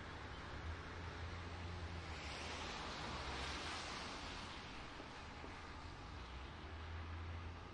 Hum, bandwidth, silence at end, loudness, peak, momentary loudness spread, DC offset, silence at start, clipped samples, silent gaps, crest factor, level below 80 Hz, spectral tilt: none; 11 kHz; 0 s; -49 LUFS; -34 dBFS; 7 LU; under 0.1%; 0 s; under 0.1%; none; 16 dB; -58 dBFS; -4 dB/octave